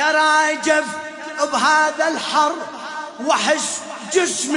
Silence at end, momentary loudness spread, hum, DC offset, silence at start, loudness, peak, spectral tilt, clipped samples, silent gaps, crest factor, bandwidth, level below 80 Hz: 0 s; 14 LU; none; under 0.1%; 0 s; -18 LUFS; -2 dBFS; -1 dB/octave; under 0.1%; none; 16 dB; 11 kHz; -72 dBFS